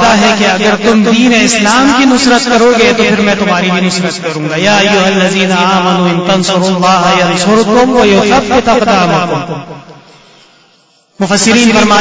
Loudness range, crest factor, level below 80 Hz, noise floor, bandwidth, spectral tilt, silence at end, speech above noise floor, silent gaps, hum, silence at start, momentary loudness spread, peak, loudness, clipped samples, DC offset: 4 LU; 8 dB; -38 dBFS; -48 dBFS; 8 kHz; -4 dB/octave; 0 s; 40 dB; none; none; 0 s; 6 LU; 0 dBFS; -8 LUFS; 0.2%; under 0.1%